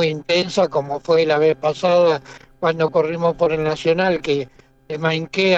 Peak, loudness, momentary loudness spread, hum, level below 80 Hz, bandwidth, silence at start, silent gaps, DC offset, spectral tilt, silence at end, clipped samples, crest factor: -6 dBFS; -19 LUFS; 7 LU; none; -52 dBFS; 8.2 kHz; 0 s; none; under 0.1%; -5.5 dB/octave; 0 s; under 0.1%; 12 dB